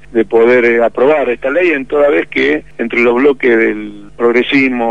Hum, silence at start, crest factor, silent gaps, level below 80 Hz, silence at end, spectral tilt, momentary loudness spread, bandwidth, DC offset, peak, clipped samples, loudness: none; 0.1 s; 10 dB; none; -46 dBFS; 0 s; -6 dB/octave; 6 LU; 7.8 kHz; 2%; 0 dBFS; under 0.1%; -11 LUFS